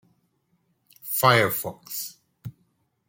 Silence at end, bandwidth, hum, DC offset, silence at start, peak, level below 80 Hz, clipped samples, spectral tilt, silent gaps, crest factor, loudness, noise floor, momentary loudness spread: 0.6 s; 17 kHz; none; under 0.1%; 1.05 s; -4 dBFS; -66 dBFS; under 0.1%; -3.5 dB/octave; none; 24 dB; -23 LUFS; -70 dBFS; 25 LU